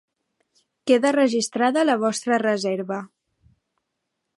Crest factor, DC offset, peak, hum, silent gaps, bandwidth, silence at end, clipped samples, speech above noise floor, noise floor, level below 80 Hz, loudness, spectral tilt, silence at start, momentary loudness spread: 18 dB; under 0.1%; -6 dBFS; none; none; 11.5 kHz; 1.3 s; under 0.1%; 58 dB; -79 dBFS; -74 dBFS; -21 LUFS; -4 dB/octave; 0.85 s; 11 LU